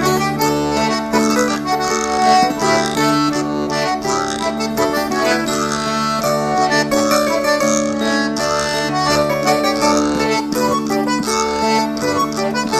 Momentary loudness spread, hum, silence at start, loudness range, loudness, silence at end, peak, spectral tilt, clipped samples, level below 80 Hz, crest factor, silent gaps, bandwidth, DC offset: 3 LU; none; 0 s; 2 LU; -16 LUFS; 0 s; -2 dBFS; -3.5 dB/octave; under 0.1%; -44 dBFS; 16 dB; none; 15.5 kHz; under 0.1%